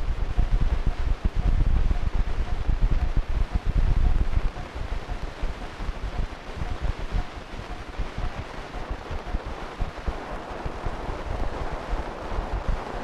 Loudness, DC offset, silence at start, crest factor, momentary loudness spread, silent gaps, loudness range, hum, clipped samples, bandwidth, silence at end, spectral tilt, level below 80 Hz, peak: -31 LUFS; under 0.1%; 0 s; 16 dB; 9 LU; none; 7 LU; none; under 0.1%; 7.8 kHz; 0 s; -6.5 dB/octave; -26 dBFS; -8 dBFS